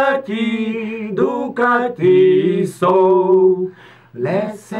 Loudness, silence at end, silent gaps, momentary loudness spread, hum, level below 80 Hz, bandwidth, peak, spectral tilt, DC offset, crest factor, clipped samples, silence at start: -16 LUFS; 0 s; none; 10 LU; none; -64 dBFS; 11 kHz; -4 dBFS; -7 dB/octave; under 0.1%; 12 dB; under 0.1%; 0 s